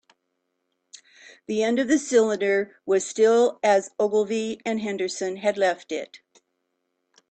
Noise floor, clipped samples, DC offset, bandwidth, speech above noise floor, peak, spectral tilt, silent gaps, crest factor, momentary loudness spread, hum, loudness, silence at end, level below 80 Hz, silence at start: -77 dBFS; under 0.1%; under 0.1%; 9 kHz; 54 dB; -8 dBFS; -4 dB/octave; none; 18 dB; 10 LU; none; -23 LUFS; 1.15 s; -72 dBFS; 1.5 s